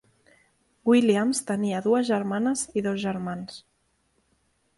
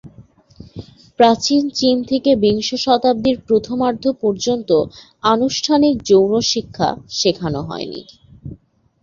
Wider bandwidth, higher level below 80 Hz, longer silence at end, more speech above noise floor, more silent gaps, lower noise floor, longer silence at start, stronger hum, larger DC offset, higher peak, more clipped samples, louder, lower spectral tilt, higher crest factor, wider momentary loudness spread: first, 11.5 kHz vs 7.6 kHz; second, -66 dBFS vs -48 dBFS; first, 1.2 s vs 0.5 s; first, 46 dB vs 30 dB; neither; first, -70 dBFS vs -46 dBFS; first, 0.85 s vs 0.05 s; neither; neither; second, -8 dBFS vs -2 dBFS; neither; second, -25 LUFS vs -17 LUFS; about the same, -5 dB/octave vs -4.5 dB/octave; about the same, 18 dB vs 16 dB; second, 13 LU vs 21 LU